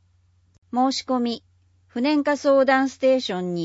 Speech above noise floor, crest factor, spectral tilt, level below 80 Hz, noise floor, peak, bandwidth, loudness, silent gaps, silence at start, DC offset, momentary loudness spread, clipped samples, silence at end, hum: 40 dB; 16 dB; -5 dB/octave; -68 dBFS; -61 dBFS; -6 dBFS; 8 kHz; -21 LUFS; none; 0.75 s; under 0.1%; 11 LU; under 0.1%; 0 s; none